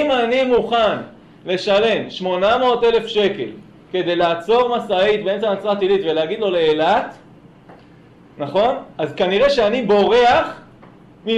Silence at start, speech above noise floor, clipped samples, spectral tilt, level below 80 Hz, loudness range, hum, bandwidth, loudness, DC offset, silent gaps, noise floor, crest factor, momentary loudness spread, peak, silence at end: 0 s; 29 dB; under 0.1%; -5.5 dB/octave; -50 dBFS; 3 LU; none; 9.2 kHz; -17 LUFS; under 0.1%; none; -46 dBFS; 12 dB; 12 LU; -6 dBFS; 0 s